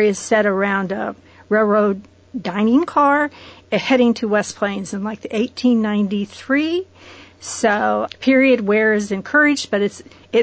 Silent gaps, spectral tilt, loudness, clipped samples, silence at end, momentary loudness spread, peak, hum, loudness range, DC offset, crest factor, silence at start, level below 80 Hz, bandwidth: none; -5 dB/octave; -18 LUFS; under 0.1%; 0 s; 11 LU; -4 dBFS; none; 3 LU; under 0.1%; 14 dB; 0 s; -56 dBFS; 8 kHz